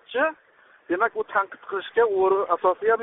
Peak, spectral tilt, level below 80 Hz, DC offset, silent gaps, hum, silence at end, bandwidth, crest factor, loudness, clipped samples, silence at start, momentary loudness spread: -8 dBFS; -1.5 dB/octave; -70 dBFS; under 0.1%; none; none; 0 s; 3.9 kHz; 16 dB; -24 LUFS; under 0.1%; 0.1 s; 8 LU